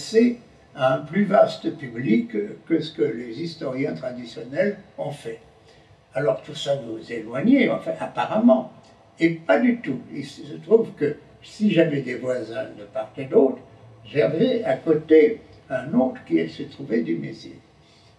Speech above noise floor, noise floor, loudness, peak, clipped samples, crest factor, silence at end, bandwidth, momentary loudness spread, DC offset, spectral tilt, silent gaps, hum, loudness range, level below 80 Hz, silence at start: 31 dB; -53 dBFS; -23 LUFS; -2 dBFS; under 0.1%; 20 dB; 0.6 s; 10.5 kHz; 17 LU; under 0.1%; -7 dB/octave; none; none; 7 LU; -66 dBFS; 0 s